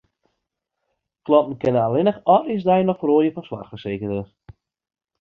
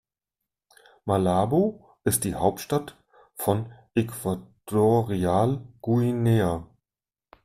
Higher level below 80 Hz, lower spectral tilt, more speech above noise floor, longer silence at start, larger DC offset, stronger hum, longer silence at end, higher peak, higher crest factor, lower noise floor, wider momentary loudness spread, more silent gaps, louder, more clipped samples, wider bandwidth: about the same, -56 dBFS vs -56 dBFS; first, -9.5 dB/octave vs -6.5 dB/octave; second, 60 dB vs over 66 dB; first, 1.25 s vs 1.05 s; neither; neither; first, 0.95 s vs 0.8 s; first, -2 dBFS vs -8 dBFS; about the same, 20 dB vs 18 dB; second, -79 dBFS vs under -90 dBFS; first, 15 LU vs 9 LU; neither; first, -20 LUFS vs -25 LUFS; neither; second, 6 kHz vs 15.5 kHz